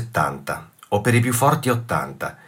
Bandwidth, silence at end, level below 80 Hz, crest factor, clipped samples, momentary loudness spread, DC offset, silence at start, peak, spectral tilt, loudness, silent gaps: 16.5 kHz; 0.15 s; -52 dBFS; 18 dB; under 0.1%; 12 LU; under 0.1%; 0 s; -4 dBFS; -5.5 dB/octave; -21 LUFS; none